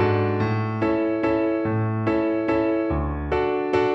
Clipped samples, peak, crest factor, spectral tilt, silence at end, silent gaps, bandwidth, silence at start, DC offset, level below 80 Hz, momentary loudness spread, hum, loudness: under 0.1%; -8 dBFS; 14 dB; -9 dB/octave; 0 s; none; 6.2 kHz; 0 s; under 0.1%; -38 dBFS; 2 LU; none; -23 LUFS